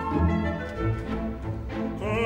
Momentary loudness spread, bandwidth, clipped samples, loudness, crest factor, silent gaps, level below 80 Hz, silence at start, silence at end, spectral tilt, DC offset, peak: 8 LU; 9 kHz; under 0.1%; -29 LUFS; 16 dB; none; -36 dBFS; 0 s; 0 s; -8 dB/octave; under 0.1%; -12 dBFS